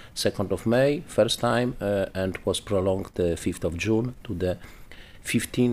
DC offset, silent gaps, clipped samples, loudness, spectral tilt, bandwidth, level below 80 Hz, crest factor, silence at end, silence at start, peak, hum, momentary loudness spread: under 0.1%; none; under 0.1%; -26 LUFS; -5.5 dB/octave; 15.5 kHz; -46 dBFS; 16 dB; 0 s; 0 s; -10 dBFS; none; 7 LU